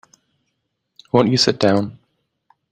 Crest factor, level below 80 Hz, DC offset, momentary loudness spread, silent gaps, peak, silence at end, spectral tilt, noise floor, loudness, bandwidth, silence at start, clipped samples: 20 dB; -56 dBFS; under 0.1%; 6 LU; none; -2 dBFS; 0.8 s; -5 dB/octave; -73 dBFS; -17 LUFS; 14.5 kHz; 1.15 s; under 0.1%